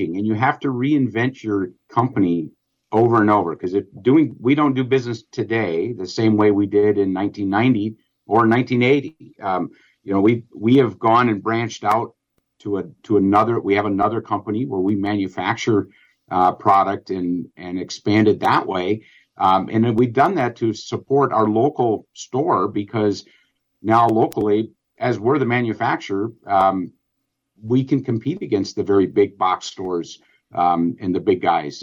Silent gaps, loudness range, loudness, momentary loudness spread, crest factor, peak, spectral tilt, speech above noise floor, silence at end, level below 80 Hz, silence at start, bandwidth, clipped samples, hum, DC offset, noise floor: none; 2 LU; -19 LUFS; 10 LU; 14 dB; -4 dBFS; -7 dB/octave; 57 dB; 0 s; -60 dBFS; 0 s; 7.8 kHz; under 0.1%; none; under 0.1%; -75 dBFS